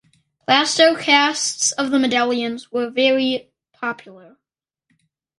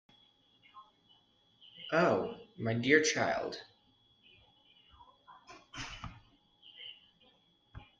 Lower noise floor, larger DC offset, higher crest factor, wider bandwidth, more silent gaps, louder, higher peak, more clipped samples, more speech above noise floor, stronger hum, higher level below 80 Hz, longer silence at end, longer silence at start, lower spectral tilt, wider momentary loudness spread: first, -86 dBFS vs -69 dBFS; neither; second, 20 dB vs 26 dB; first, 11.5 kHz vs 9.4 kHz; neither; first, -18 LUFS vs -32 LUFS; first, 0 dBFS vs -12 dBFS; neither; first, 68 dB vs 39 dB; neither; about the same, -68 dBFS vs -64 dBFS; first, 1.2 s vs 0.15 s; second, 0.5 s vs 0.75 s; second, -1.5 dB/octave vs -4 dB/octave; second, 13 LU vs 29 LU